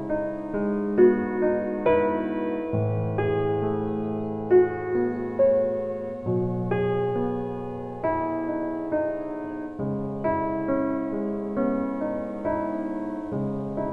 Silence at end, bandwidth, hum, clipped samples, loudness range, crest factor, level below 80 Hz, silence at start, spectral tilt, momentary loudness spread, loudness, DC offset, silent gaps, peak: 0 s; 4 kHz; none; under 0.1%; 4 LU; 18 dB; -52 dBFS; 0 s; -10.5 dB/octave; 9 LU; -26 LUFS; under 0.1%; none; -8 dBFS